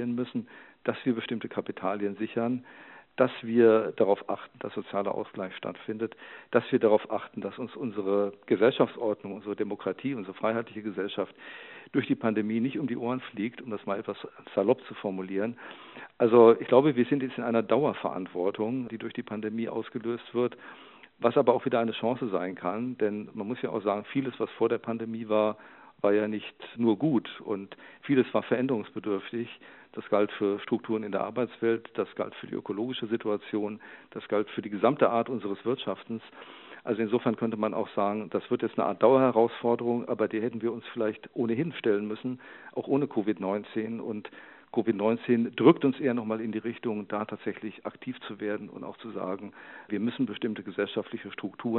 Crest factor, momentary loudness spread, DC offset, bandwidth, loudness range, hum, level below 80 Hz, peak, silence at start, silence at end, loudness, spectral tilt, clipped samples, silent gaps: 22 dB; 14 LU; under 0.1%; 4.2 kHz; 7 LU; none; -78 dBFS; -6 dBFS; 0 s; 0 s; -29 LUFS; -5.5 dB/octave; under 0.1%; none